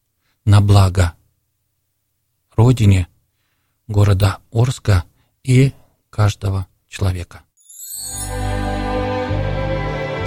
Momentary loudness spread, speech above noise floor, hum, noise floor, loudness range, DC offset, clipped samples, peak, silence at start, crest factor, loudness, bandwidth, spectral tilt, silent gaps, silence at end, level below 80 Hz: 14 LU; 56 dB; none; -70 dBFS; 6 LU; under 0.1%; under 0.1%; -2 dBFS; 0.45 s; 16 dB; -18 LUFS; 17 kHz; -6.5 dB/octave; none; 0 s; -32 dBFS